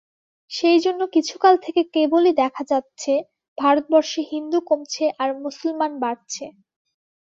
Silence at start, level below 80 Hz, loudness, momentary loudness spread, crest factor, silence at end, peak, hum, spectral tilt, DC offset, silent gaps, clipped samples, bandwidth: 0.5 s; -70 dBFS; -20 LUFS; 10 LU; 18 dB; 0.7 s; -2 dBFS; none; -2.5 dB/octave; under 0.1%; 3.48-3.56 s; under 0.1%; 7.6 kHz